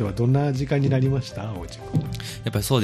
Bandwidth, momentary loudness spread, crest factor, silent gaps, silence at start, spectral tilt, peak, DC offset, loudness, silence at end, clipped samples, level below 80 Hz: 14.5 kHz; 11 LU; 14 dB; none; 0 s; -6.5 dB/octave; -8 dBFS; under 0.1%; -24 LUFS; 0 s; under 0.1%; -42 dBFS